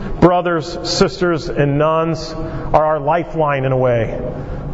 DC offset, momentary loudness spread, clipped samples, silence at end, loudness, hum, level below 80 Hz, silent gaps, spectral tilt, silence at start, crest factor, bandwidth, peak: under 0.1%; 11 LU; under 0.1%; 0 s; -17 LUFS; none; -32 dBFS; none; -6 dB/octave; 0 s; 16 dB; 8 kHz; 0 dBFS